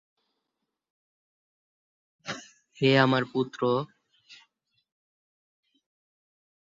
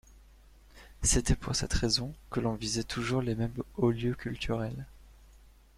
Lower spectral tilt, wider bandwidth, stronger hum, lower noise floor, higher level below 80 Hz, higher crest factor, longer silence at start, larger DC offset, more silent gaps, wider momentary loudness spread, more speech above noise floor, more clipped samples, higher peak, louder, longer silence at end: first, -6 dB/octave vs -4 dB/octave; second, 7.8 kHz vs 15.5 kHz; neither; first, -84 dBFS vs -57 dBFS; second, -72 dBFS vs -42 dBFS; first, 26 dB vs 20 dB; first, 2.25 s vs 0.1 s; neither; neither; first, 19 LU vs 8 LU; first, 60 dB vs 26 dB; neither; first, -6 dBFS vs -12 dBFS; first, -25 LUFS vs -31 LUFS; first, 2.3 s vs 0.5 s